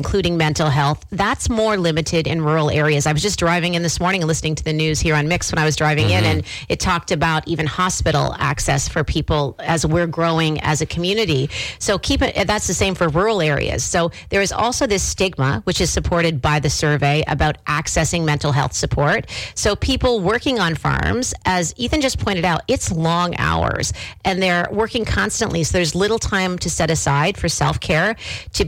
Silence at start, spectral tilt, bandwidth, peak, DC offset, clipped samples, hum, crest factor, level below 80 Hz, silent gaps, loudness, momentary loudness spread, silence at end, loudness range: 0 s; -4.5 dB/octave; 16.5 kHz; -6 dBFS; under 0.1%; under 0.1%; none; 12 dB; -34 dBFS; none; -18 LUFS; 3 LU; 0 s; 1 LU